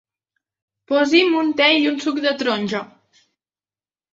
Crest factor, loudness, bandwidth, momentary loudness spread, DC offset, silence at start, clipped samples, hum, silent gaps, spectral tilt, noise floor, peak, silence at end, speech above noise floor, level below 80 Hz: 20 dB; -18 LUFS; 7.8 kHz; 8 LU; under 0.1%; 0.9 s; under 0.1%; none; none; -4 dB/octave; under -90 dBFS; -2 dBFS; 1.25 s; over 72 dB; -68 dBFS